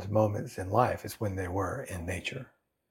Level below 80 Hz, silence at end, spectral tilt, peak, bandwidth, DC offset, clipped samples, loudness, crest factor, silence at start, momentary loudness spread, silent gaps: -62 dBFS; 0.45 s; -6 dB/octave; -10 dBFS; 16.5 kHz; under 0.1%; under 0.1%; -32 LUFS; 22 dB; 0 s; 10 LU; none